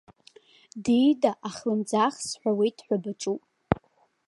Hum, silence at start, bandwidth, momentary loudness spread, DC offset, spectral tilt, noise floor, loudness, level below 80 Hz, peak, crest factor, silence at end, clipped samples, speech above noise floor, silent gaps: none; 0.75 s; 11.5 kHz; 10 LU; under 0.1%; -5.5 dB/octave; -62 dBFS; -27 LUFS; -56 dBFS; -2 dBFS; 26 dB; 0.55 s; under 0.1%; 36 dB; none